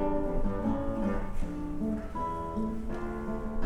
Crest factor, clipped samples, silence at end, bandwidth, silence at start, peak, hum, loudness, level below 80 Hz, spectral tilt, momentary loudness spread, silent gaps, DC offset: 14 dB; under 0.1%; 0 s; 9 kHz; 0 s; -16 dBFS; none; -34 LUFS; -36 dBFS; -8.5 dB/octave; 5 LU; none; under 0.1%